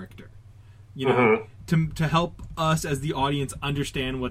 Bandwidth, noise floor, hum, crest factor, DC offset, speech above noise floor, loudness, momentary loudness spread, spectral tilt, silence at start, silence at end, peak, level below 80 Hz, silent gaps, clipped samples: 15.5 kHz; -48 dBFS; none; 18 dB; under 0.1%; 24 dB; -25 LUFS; 8 LU; -5.5 dB/octave; 0 s; 0 s; -6 dBFS; -44 dBFS; none; under 0.1%